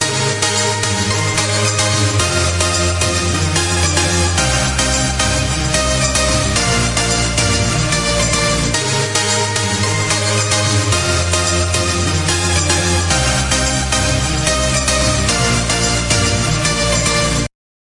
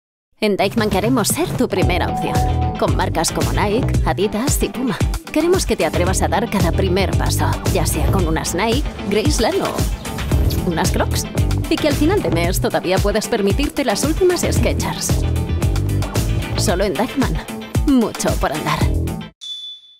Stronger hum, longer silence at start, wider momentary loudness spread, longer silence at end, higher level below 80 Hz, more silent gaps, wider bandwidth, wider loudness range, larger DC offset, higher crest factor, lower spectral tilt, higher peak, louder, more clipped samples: neither; second, 0 s vs 0.4 s; about the same, 2 LU vs 4 LU; first, 0.4 s vs 0.2 s; about the same, -26 dBFS vs -26 dBFS; second, none vs 19.35-19.41 s; second, 11.5 kHz vs 16.5 kHz; about the same, 0 LU vs 2 LU; neither; about the same, 14 dB vs 12 dB; second, -3 dB/octave vs -5 dB/octave; first, 0 dBFS vs -6 dBFS; first, -14 LUFS vs -18 LUFS; neither